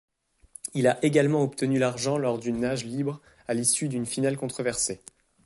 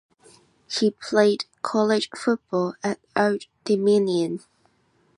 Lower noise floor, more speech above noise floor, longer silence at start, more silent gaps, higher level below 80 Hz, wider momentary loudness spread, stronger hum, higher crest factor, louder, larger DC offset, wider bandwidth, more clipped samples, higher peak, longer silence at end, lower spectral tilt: second, -52 dBFS vs -64 dBFS; second, 27 dB vs 42 dB; about the same, 0.65 s vs 0.7 s; neither; first, -62 dBFS vs -72 dBFS; about the same, 10 LU vs 10 LU; neither; about the same, 18 dB vs 18 dB; second, -26 LUFS vs -23 LUFS; neither; about the same, 12 kHz vs 11.5 kHz; neither; about the same, -8 dBFS vs -6 dBFS; second, 0.5 s vs 0.8 s; about the same, -4.5 dB/octave vs -5 dB/octave